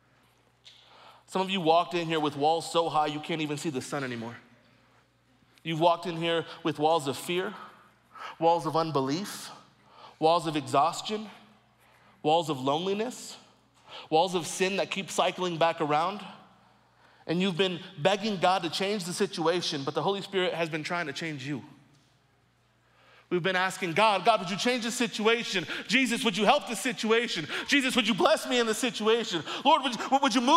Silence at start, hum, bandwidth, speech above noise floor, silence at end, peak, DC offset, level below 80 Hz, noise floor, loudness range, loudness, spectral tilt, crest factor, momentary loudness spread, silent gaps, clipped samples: 0.65 s; none; 16 kHz; 39 dB; 0 s; -8 dBFS; under 0.1%; -74 dBFS; -66 dBFS; 6 LU; -28 LUFS; -4 dB/octave; 22 dB; 11 LU; none; under 0.1%